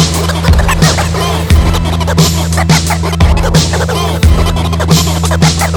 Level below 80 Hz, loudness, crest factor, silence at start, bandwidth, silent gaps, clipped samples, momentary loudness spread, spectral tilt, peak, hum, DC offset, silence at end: -14 dBFS; -10 LUFS; 10 dB; 0 s; over 20 kHz; none; 0.4%; 3 LU; -4.5 dB/octave; 0 dBFS; none; under 0.1%; 0 s